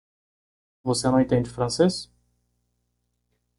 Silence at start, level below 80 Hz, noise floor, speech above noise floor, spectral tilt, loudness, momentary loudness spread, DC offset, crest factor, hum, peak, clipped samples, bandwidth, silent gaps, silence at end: 0.85 s; -54 dBFS; -75 dBFS; 53 dB; -5.5 dB/octave; -23 LUFS; 10 LU; under 0.1%; 20 dB; 60 Hz at -40 dBFS; -6 dBFS; under 0.1%; 11.5 kHz; none; 1.55 s